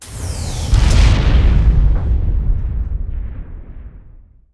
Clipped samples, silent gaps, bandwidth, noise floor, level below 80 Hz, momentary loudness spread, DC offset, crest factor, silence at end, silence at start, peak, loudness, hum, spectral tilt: under 0.1%; none; 11 kHz; -41 dBFS; -16 dBFS; 21 LU; under 0.1%; 14 dB; 0.4 s; 0 s; 0 dBFS; -17 LUFS; none; -5.5 dB/octave